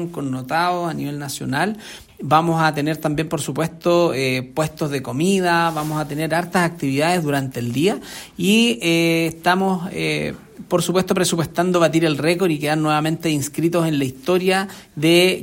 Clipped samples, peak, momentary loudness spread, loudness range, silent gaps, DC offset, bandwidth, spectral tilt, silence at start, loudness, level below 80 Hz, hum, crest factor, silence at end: under 0.1%; -2 dBFS; 8 LU; 2 LU; none; under 0.1%; 16.5 kHz; -5 dB/octave; 0 s; -19 LUFS; -54 dBFS; none; 18 dB; 0 s